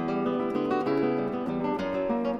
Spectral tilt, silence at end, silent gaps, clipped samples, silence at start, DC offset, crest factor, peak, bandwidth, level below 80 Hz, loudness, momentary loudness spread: -8 dB/octave; 0 s; none; under 0.1%; 0 s; under 0.1%; 14 dB; -14 dBFS; 7.2 kHz; -58 dBFS; -28 LUFS; 3 LU